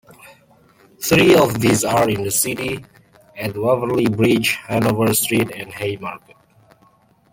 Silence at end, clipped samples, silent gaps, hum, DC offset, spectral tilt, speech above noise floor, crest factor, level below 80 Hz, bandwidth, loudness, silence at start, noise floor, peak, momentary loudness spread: 1.15 s; under 0.1%; none; none; under 0.1%; -4.5 dB/octave; 38 dB; 18 dB; -52 dBFS; 17 kHz; -17 LUFS; 0.25 s; -55 dBFS; -2 dBFS; 14 LU